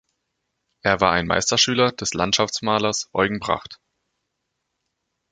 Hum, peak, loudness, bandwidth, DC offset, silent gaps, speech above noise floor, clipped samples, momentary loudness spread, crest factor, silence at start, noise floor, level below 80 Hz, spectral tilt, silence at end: none; -2 dBFS; -20 LUFS; 10 kHz; under 0.1%; none; 57 dB; under 0.1%; 8 LU; 22 dB; 0.85 s; -78 dBFS; -50 dBFS; -3 dB/octave; 1.55 s